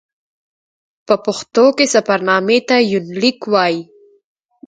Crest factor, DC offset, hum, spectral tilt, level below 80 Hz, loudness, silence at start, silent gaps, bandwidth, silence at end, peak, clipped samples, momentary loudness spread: 16 dB; under 0.1%; none; -3.5 dB/octave; -64 dBFS; -15 LUFS; 1.1 s; none; 9.6 kHz; 0.85 s; 0 dBFS; under 0.1%; 6 LU